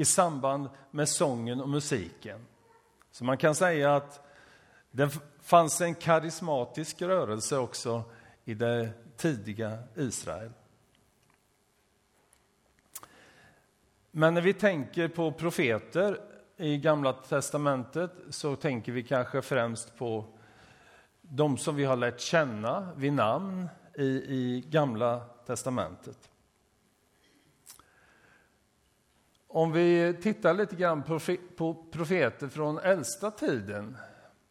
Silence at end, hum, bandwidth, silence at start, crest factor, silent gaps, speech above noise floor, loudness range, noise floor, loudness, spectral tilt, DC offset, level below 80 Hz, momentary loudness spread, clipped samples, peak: 0.4 s; none; 16 kHz; 0 s; 24 dB; none; 41 dB; 8 LU; -70 dBFS; -30 LUFS; -5 dB/octave; under 0.1%; -68 dBFS; 14 LU; under 0.1%; -8 dBFS